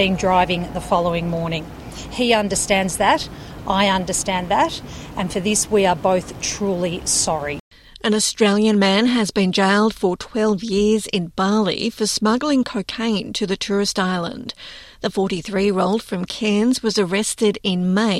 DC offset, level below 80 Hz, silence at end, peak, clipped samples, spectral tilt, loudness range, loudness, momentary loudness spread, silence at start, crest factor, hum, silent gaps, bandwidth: under 0.1%; -44 dBFS; 0 s; -2 dBFS; under 0.1%; -4 dB/octave; 4 LU; -19 LUFS; 10 LU; 0 s; 18 dB; none; 7.60-7.71 s; 13.5 kHz